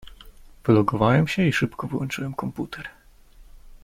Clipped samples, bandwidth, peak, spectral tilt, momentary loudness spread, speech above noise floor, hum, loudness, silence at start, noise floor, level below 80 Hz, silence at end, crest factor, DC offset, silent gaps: under 0.1%; 16 kHz; -4 dBFS; -7 dB/octave; 14 LU; 27 dB; none; -23 LUFS; 0.05 s; -50 dBFS; -48 dBFS; 0.05 s; 20 dB; under 0.1%; none